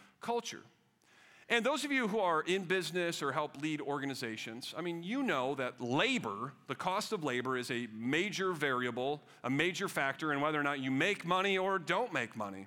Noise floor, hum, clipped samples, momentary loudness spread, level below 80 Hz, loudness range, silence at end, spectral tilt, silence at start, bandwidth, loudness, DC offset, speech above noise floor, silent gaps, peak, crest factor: -66 dBFS; none; under 0.1%; 8 LU; -80 dBFS; 3 LU; 0 s; -4 dB/octave; 0 s; 18.5 kHz; -34 LUFS; under 0.1%; 31 dB; none; -16 dBFS; 20 dB